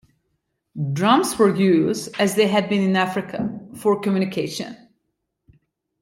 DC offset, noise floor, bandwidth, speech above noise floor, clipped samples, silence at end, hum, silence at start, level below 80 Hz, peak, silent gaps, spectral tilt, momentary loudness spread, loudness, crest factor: under 0.1%; -76 dBFS; 16.5 kHz; 56 dB; under 0.1%; 1.25 s; none; 0.75 s; -62 dBFS; -4 dBFS; none; -5.5 dB/octave; 12 LU; -20 LUFS; 18 dB